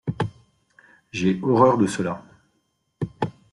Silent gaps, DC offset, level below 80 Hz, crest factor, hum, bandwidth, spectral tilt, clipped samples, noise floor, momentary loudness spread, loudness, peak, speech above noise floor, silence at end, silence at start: none; under 0.1%; -58 dBFS; 22 dB; none; 11.5 kHz; -6.5 dB/octave; under 0.1%; -71 dBFS; 16 LU; -23 LUFS; -2 dBFS; 51 dB; 0.2 s; 0.05 s